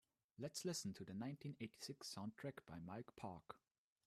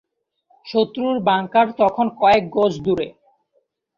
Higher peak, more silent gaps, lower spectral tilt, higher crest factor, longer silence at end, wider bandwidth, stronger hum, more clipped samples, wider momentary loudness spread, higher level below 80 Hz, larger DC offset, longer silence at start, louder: second, -36 dBFS vs -4 dBFS; neither; second, -4.5 dB/octave vs -6.5 dB/octave; about the same, 16 dB vs 16 dB; second, 0.5 s vs 0.9 s; first, 15 kHz vs 7.4 kHz; neither; neither; first, 11 LU vs 7 LU; second, -82 dBFS vs -54 dBFS; neither; second, 0.4 s vs 0.65 s; second, -52 LUFS vs -19 LUFS